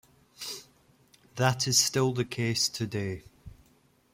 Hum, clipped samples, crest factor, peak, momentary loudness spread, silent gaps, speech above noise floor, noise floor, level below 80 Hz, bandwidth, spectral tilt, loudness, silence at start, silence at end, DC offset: none; under 0.1%; 22 dB; -10 dBFS; 18 LU; none; 37 dB; -65 dBFS; -62 dBFS; 16.5 kHz; -3.5 dB/octave; -28 LUFS; 0.4 s; 0.65 s; under 0.1%